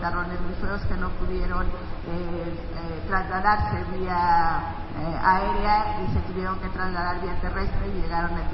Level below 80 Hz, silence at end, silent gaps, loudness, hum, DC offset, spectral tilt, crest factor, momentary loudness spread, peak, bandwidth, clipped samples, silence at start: -32 dBFS; 0 s; none; -27 LUFS; none; under 0.1%; -9.5 dB/octave; 18 dB; 11 LU; -6 dBFS; 5.8 kHz; under 0.1%; 0 s